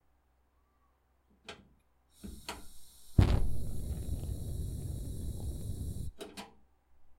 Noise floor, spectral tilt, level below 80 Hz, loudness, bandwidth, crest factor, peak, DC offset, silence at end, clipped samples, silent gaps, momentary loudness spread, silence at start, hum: -72 dBFS; -6.5 dB/octave; -40 dBFS; -37 LUFS; 16 kHz; 26 dB; -10 dBFS; under 0.1%; 0.05 s; under 0.1%; none; 22 LU; 1.5 s; none